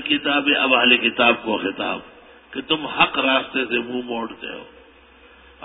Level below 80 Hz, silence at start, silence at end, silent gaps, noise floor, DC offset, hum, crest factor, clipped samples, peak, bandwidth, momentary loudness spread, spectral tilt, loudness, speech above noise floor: -58 dBFS; 0 s; 0 s; none; -49 dBFS; under 0.1%; none; 20 dB; under 0.1%; 0 dBFS; 4.1 kHz; 18 LU; -8 dB/octave; -19 LUFS; 29 dB